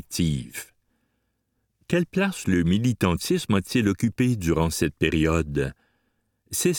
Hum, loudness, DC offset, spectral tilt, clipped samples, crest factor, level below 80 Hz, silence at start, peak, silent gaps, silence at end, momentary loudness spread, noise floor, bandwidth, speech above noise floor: none; -24 LUFS; under 0.1%; -5.5 dB/octave; under 0.1%; 18 dB; -42 dBFS; 0.1 s; -6 dBFS; none; 0 s; 7 LU; -74 dBFS; 19 kHz; 51 dB